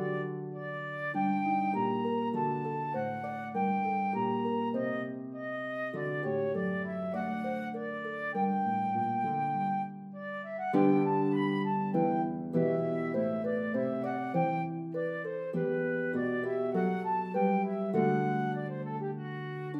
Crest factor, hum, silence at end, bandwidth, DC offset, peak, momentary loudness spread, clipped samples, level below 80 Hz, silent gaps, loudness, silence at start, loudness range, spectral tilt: 18 dB; none; 0 s; 5.8 kHz; under 0.1%; -14 dBFS; 8 LU; under 0.1%; -80 dBFS; none; -32 LUFS; 0 s; 3 LU; -9 dB/octave